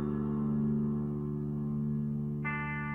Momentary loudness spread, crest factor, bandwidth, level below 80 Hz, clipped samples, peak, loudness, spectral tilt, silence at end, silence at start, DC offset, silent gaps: 4 LU; 10 dB; 3.2 kHz; -52 dBFS; under 0.1%; -22 dBFS; -34 LUFS; -11 dB/octave; 0 s; 0 s; under 0.1%; none